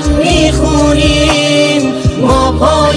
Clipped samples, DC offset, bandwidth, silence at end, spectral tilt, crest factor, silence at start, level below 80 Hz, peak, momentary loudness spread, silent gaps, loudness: under 0.1%; under 0.1%; 10.5 kHz; 0 s; -5 dB/octave; 10 dB; 0 s; -18 dBFS; 0 dBFS; 3 LU; none; -9 LUFS